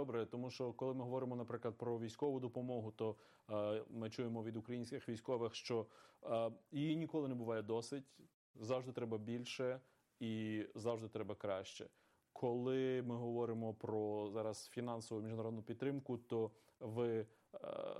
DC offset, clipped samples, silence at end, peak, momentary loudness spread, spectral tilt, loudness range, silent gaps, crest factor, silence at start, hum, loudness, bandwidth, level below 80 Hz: under 0.1%; under 0.1%; 0 s; -28 dBFS; 7 LU; -6.5 dB/octave; 2 LU; 8.34-8.54 s; 16 dB; 0 s; none; -44 LUFS; 13 kHz; -86 dBFS